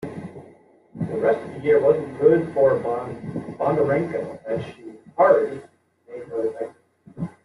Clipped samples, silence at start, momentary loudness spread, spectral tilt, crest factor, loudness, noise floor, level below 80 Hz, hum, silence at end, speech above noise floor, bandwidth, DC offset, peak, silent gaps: under 0.1%; 0 s; 19 LU; -8.5 dB/octave; 20 dB; -22 LUFS; -52 dBFS; -62 dBFS; none; 0.15 s; 31 dB; 11 kHz; under 0.1%; -4 dBFS; none